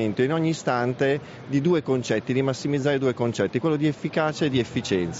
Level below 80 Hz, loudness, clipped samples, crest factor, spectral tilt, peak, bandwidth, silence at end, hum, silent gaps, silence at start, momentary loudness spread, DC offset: -60 dBFS; -24 LUFS; under 0.1%; 14 dB; -5.5 dB/octave; -10 dBFS; 8 kHz; 0 s; none; none; 0 s; 3 LU; under 0.1%